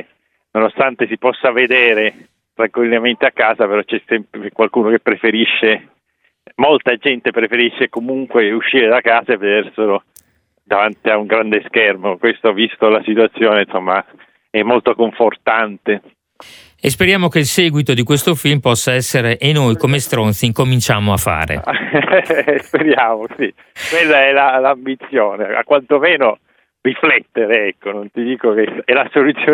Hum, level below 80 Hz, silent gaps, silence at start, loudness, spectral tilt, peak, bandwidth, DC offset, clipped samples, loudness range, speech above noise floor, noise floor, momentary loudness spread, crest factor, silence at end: none; -46 dBFS; none; 0.55 s; -14 LUFS; -4.5 dB/octave; 0 dBFS; over 20 kHz; under 0.1%; under 0.1%; 2 LU; 49 dB; -63 dBFS; 8 LU; 14 dB; 0 s